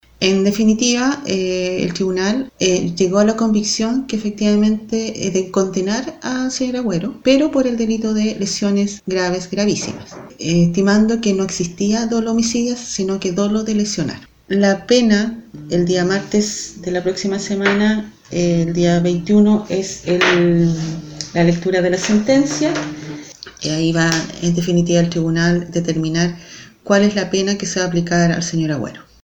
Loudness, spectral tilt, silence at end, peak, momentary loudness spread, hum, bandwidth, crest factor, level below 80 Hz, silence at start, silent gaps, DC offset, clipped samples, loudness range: -17 LUFS; -5 dB/octave; 0.2 s; 0 dBFS; 9 LU; none; 19 kHz; 16 dB; -46 dBFS; 0.2 s; none; under 0.1%; under 0.1%; 2 LU